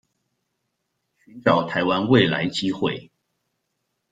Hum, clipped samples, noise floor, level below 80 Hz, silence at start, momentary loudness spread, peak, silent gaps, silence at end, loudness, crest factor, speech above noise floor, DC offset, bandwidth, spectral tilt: none; under 0.1%; -76 dBFS; -60 dBFS; 1.35 s; 9 LU; -2 dBFS; none; 1.1 s; -21 LUFS; 22 dB; 56 dB; under 0.1%; 9.2 kHz; -6 dB/octave